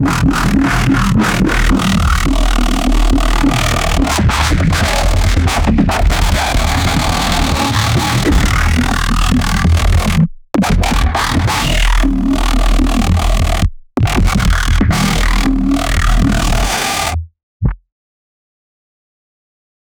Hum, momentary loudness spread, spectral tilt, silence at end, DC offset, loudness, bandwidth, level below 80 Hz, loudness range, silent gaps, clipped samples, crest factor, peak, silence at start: none; 2 LU; -5 dB/octave; 2.25 s; under 0.1%; -14 LUFS; 19.5 kHz; -16 dBFS; 3 LU; 17.43-17.60 s; under 0.1%; 10 dB; -2 dBFS; 0 s